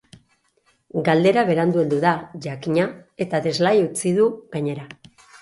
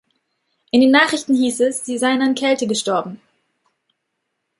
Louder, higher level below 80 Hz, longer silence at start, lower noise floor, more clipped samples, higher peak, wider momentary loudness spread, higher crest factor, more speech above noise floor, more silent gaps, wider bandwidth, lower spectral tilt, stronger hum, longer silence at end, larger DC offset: second, -21 LUFS vs -17 LUFS; about the same, -64 dBFS vs -66 dBFS; first, 0.95 s vs 0.75 s; second, -64 dBFS vs -75 dBFS; neither; second, -4 dBFS vs 0 dBFS; first, 13 LU vs 8 LU; about the same, 18 dB vs 18 dB; second, 44 dB vs 58 dB; neither; about the same, 11.5 kHz vs 11.5 kHz; first, -6 dB/octave vs -3 dB/octave; neither; second, 0.45 s vs 1.45 s; neither